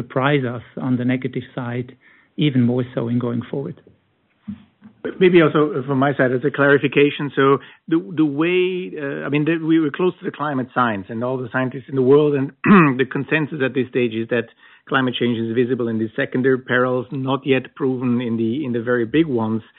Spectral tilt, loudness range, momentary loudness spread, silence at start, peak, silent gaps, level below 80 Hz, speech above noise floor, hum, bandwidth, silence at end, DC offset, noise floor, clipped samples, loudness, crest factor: -5.5 dB/octave; 5 LU; 12 LU; 0 s; -2 dBFS; none; -62 dBFS; 44 dB; none; 4.2 kHz; 0.2 s; under 0.1%; -63 dBFS; under 0.1%; -19 LUFS; 16 dB